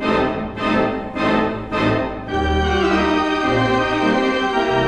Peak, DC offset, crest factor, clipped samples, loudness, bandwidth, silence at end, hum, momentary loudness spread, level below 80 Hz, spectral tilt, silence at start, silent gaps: -4 dBFS; under 0.1%; 14 dB; under 0.1%; -19 LUFS; 10 kHz; 0 s; none; 5 LU; -34 dBFS; -6 dB/octave; 0 s; none